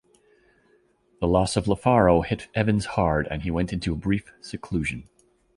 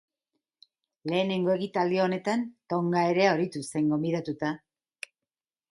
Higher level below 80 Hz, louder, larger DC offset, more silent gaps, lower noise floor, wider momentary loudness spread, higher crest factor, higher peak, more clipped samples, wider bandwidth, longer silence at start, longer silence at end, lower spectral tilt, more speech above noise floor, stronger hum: first, -40 dBFS vs -72 dBFS; first, -24 LUFS vs -27 LUFS; neither; neither; second, -63 dBFS vs under -90 dBFS; second, 11 LU vs 17 LU; about the same, 20 dB vs 20 dB; first, -4 dBFS vs -10 dBFS; neither; about the same, 11.5 kHz vs 11.5 kHz; first, 1.2 s vs 1.05 s; second, 0.55 s vs 1.15 s; about the same, -6.5 dB/octave vs -6 dB/octave; second, 40 dB vs over 63 dB; neither